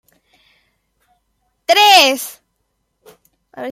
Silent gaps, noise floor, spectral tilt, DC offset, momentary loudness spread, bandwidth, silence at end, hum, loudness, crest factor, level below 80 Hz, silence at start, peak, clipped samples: none; -69 dBFS; 0.5 dB/octave; under 0.1%; 22 LU; 16 kHz; 0 s; none; -10 LUFS; 18 dB; -70 dBFS; 1.7 s; 0 dBFS; under 0.1%